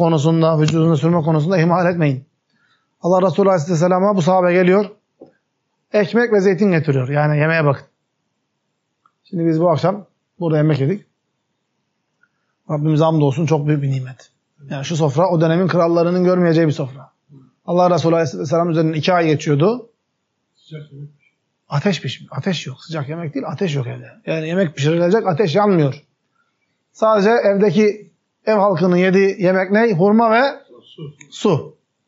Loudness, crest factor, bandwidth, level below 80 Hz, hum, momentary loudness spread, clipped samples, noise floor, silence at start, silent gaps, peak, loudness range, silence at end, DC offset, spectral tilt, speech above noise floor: -16 LUFS; 14 dB; 7.8 kHz; -70 dBFS; none; 13 LU; under 0.1%; -72 dBFS; 0 s; none; -4 dBFS; 6 LU; 0.35 s; under 0.1%; -6.5 dB/octave; 56 dB